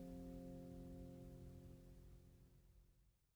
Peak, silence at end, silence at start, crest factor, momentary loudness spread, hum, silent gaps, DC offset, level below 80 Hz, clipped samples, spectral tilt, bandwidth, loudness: -44 dBFS; 0.1 s; 0 s; 14 dB; 11 LU; none; none; under 0.1%; -66 dBFS; under 0.1%; -8 dB/octave; over 20 kHz; -58 LUFS